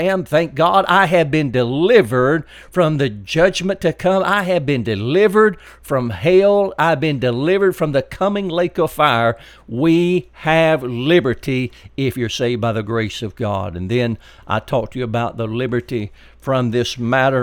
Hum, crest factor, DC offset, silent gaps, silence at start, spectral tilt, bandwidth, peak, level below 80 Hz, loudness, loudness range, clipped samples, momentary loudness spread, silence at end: none; 16 dB; under 0.1%; none; 0 s; -6.5 dB/octave; 17.5 kHz; 0 dBFS; -46 dBFS; -17 LUFS; 6 LU; under 0.1%; 9 LU; 0 s